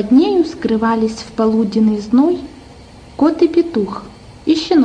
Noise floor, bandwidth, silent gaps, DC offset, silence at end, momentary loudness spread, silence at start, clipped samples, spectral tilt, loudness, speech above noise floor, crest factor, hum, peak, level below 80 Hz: -38 dBFS; 9.8 kHz; none; under 0.1%; 0 s; 11 LU; 0 s; under 0.1%; -6.5 dB/octave; -15 LUFS; 24 dB; 14 dB; none; -2 dBFS; -44 dBFS